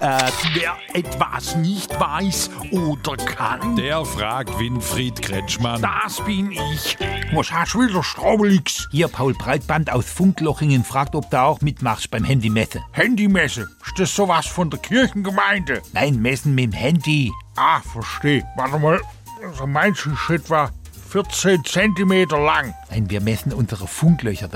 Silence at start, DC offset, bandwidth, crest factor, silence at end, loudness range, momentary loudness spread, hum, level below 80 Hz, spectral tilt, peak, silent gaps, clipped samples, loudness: 0 s; under 0.1%; 17 kHz; 18 dB; 0 s; 3 LU; 7 LU; none; -40 dBFS; -5 dB/octave; -2 dBFS; none; under 0.1%; -20 LUFS